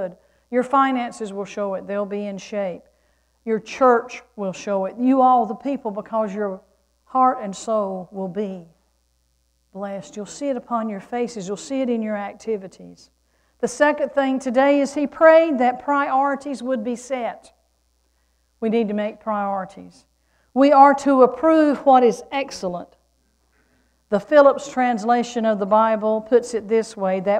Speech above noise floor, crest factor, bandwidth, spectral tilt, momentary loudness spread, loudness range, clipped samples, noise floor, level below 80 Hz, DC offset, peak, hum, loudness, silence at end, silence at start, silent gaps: 46 dB; 20 dB; 10.5 kHz; -5.5 dB/octave; 15 LU; 10 LU; under 0.1%; -66 dBFS; -62 dBFS; under 0.1%; 0 dBFS; none; -20 LUFS; 0 s; 0 s; none